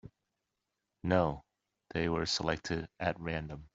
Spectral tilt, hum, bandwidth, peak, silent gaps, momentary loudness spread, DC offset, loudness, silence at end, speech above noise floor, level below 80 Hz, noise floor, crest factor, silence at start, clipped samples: -4 dB/octave; none; 7.8 kHz; -12 dBFS; none; 10 LU; under 0.1%; -34 LUFS; 0.1 s; 53 dB; -56 dBFS; -86 dBFS; 24 dB; 0.05 s; under 0.1%